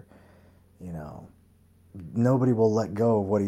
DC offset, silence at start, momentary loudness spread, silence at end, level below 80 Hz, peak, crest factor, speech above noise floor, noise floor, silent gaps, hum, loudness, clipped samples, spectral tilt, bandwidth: under 0.1%; 0.8 s; 23 LU; 0 s; -58 dBFS; -10 dBFS; 16 dB; 34 dB; -59 dBFS; none; none; -24 LUFS; under 0.1%; -9 dB/octave; 12 kHz